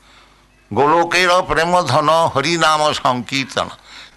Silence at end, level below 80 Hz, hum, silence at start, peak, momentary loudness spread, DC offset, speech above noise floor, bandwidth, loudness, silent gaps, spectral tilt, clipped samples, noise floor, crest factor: 0.1 s; -46 dBFS; none; 0.7 s; -4 dBFS; 9 LU; under 0.1%; 34 dB; 12 kHz; -15 LUFS; none; -4 dB/octave; under 0.1%; -50 dBFS; 14 dB